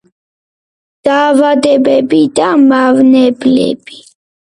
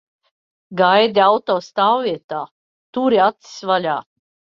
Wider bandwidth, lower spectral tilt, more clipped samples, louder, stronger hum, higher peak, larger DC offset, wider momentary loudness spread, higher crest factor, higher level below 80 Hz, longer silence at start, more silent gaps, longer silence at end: first, 11 kHz vs 7.4 kHz; about the same, -5 dB/octave vs -5 dB/octave; neither; first, -9 LUFS vs -17 LUFS; neither; about the same, 0 dBFS vs -2 dBFS; neither; second, 6 LU vs 15 LU; second, 10 dB vs 18 dB; first, -54 dBFS vs -66 dBFS; first, 1.05 s vs 0.7 s; second, none vs 2.24-2.29 s, 2.51-2.93 s; about the same, 0.55 s vs 0.55 s